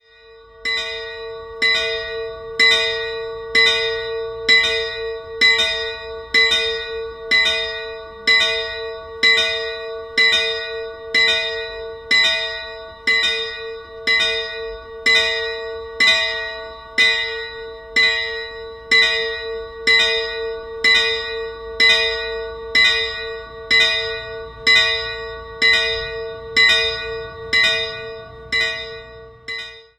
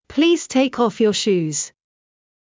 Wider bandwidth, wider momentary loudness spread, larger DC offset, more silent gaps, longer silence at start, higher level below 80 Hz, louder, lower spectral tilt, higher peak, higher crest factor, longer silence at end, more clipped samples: first, 15 kHz vs 7.8 kHz; first, 16 LU vs 7 LU; neither; neither; first, 0.25 s vs 0.1 s; first, -46 dBFS vs -60 dBFS; about the same, -16 LUFS vs -18 LUFS; second, -0.5 dB/octave vs -4 dB/octave; first, -2 dBFS vs -6 dBFS; about the same, 18 dB vs 14 dB; second, 0.15 s vs 0.9 s; neither